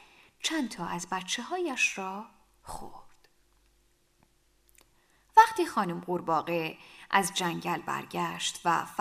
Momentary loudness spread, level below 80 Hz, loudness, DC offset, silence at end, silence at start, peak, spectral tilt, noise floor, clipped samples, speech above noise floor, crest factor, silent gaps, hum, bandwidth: 18 LU; -64 dBFS; -29 LUFS; under 0.1%; 0 s; 0.4 s; -6 dBFS; -3 dB/octave; -68 dBFS; under 0.1%; 36 dB; 24 dB; none; none; 15.5 kHz